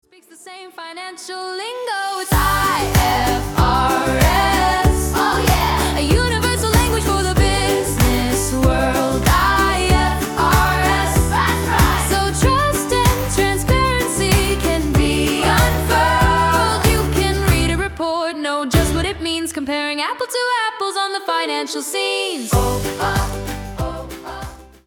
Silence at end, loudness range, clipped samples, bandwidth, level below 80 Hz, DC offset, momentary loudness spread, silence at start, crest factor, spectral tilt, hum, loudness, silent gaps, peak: 0.2 s; 4 LU; under 0.1%; 18 kHz; -24 dBFS; under 0.1%; 11 LU; 0.45 s; 14 dB; -4.5 dB/octave; none; -17 LUFS; none; -2 dBFS